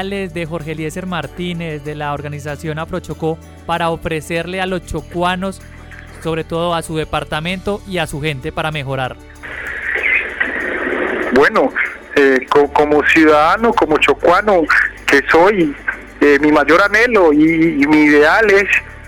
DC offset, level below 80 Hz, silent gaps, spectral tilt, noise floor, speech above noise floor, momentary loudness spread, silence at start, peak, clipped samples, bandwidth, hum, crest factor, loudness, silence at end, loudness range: under 0.1%; -38 dBFS; none; -5.5 dB/octave; -34 dBFS; 20 dB; 14 LU; 0 s; -2 dBFS; under 0.1%; 17 kHz; none; 12 dB; -14 LUFS; 0 s; 10 LU